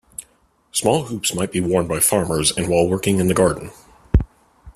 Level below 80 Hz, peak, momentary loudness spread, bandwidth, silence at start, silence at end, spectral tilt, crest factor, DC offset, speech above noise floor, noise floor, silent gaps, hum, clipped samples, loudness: -32 dBFS; -2 dBFS; 14 LU; 15.5 kHz; 0.2 s; 0.05 s; -4.5 dB/octave; 18 dB; under 0.1%; 40 dB; -59 dBFS; none; none; under 0.1%; -19 LUFS